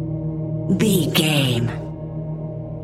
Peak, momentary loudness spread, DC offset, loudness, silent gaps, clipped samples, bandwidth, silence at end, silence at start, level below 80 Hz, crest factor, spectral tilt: -4 dBFS; 13 LU; under 0.1%; -21 LUFS; none; under 0.1%; 16 kHz; 0 s; 0 s; -44 dBFS; 18 dB; -5 dB/octave